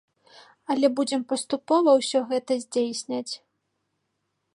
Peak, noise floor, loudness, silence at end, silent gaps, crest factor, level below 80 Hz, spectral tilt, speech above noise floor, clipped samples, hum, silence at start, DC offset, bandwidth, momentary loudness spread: -8 dBFS; -77 dBFS; -24 LUFS; 1.2 s; none; 18 dB; -82 dBFS; -3 dB/octave; 53 dB; under 0.1%; none; 0.7 s; under 0.1%; 11.5 kHz; 12 LU